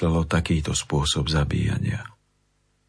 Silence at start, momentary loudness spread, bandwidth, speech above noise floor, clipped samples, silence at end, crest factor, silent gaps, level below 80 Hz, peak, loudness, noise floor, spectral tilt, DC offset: 0 s; 7 LU; 11 kHz; 44 dB; under 0.1%; 0.8 s; 18 dB; none; -34 dBFS; -6 dBFS; -24 LUFS; -67 dBFS; -5 dB/octave; under 0.1%